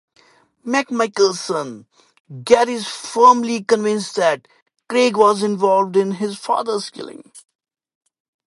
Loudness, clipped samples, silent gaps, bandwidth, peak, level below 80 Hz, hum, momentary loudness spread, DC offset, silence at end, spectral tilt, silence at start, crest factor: -17 LUFS; under 0.1%; 2.20-2.24 s, 4.62-4.66 s; 11.5 kHz; 0 dBFS; -66 dBFS; none; 14 LU; under 0.1%; 1.15 s; -4 dB/octave; 0.65 s; 18 dB